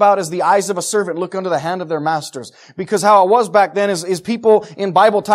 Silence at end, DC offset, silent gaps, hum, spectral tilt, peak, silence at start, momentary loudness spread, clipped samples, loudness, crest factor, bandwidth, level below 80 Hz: 0 s; under 0.1%; none; none; -4 dB/octave; 0 dBFS; 0 s; 10 LU; under 0.1%; -15 LUFS; 14 dB; 15 kHz; -66 dBFS